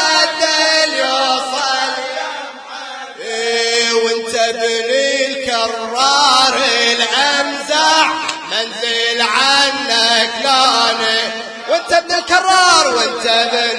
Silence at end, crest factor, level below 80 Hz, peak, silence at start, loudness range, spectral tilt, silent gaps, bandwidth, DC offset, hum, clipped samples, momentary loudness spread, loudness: 0 s; 14 dB; -58 dBFS; 0 dBFS; 0 s; 4 LU; 0 dB/octave; none; 10.5 kHz; under 0.1%; none; under 0.1%; 10 LU; -13 LUFS